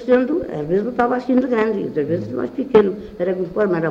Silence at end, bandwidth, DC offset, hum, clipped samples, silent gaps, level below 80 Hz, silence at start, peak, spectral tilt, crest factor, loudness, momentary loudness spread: 0 s; 7.2 kHz; under 0.1%; none; under 0.1%; none; -50 dBFS; 0 s; 0 dBFS; -8.5 dB/octave; 18 dB; -19 LUFS; 7 LU